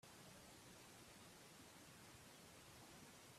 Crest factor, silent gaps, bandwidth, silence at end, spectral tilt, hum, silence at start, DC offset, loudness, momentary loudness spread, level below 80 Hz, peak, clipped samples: 16 dB; none; 15.5 kHz; 0 s; -3 dB/octave; none; 0.05 s; under 0.1%; -62 LUFS; 1 LU; -82 dBFS; -48 dBFS; under 0.1%